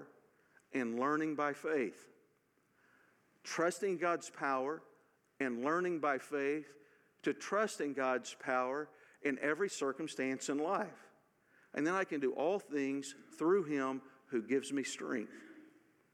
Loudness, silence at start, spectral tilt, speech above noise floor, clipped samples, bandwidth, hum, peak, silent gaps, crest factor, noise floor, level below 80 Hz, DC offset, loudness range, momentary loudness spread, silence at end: -37 LUFS; 0 s; -4.5 dB/octave; 39 dB; under 0.1%; 14.5 kHz; none; -20 dBFS; none; 18 dB; -75 dBFS; under -90 dBFS; under 0.1%; 3 LU; 8 LU; 0.45 s